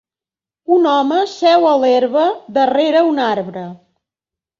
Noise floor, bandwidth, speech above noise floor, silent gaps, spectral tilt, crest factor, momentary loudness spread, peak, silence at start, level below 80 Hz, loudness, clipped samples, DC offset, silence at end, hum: under -90 dBFS; 7.4 kHz; over 76 dB; none; -5.5 dB/octave; 14 dB; 13 LU; -2 dBFS; 0.7 s; -64 dBFS; -14 LUFS; under 0.1%; under 0.1%; 0.85 s; none